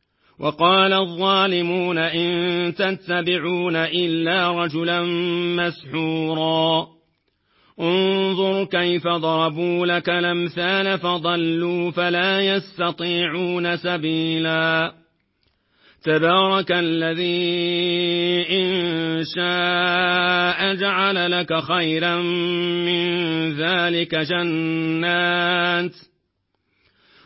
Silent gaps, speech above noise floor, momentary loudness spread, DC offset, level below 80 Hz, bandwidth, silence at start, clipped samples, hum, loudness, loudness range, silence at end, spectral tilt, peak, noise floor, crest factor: none; 52 dB; 5 LU; under 0.1%; -64 dBFS; 5.8 kHz; 0.4 s; under 0.1%; none; -20 LUFS; 3 LU; 1.25 s; -9.5 dB/octave; -4 dBFS; -72 dBFS; 18 dB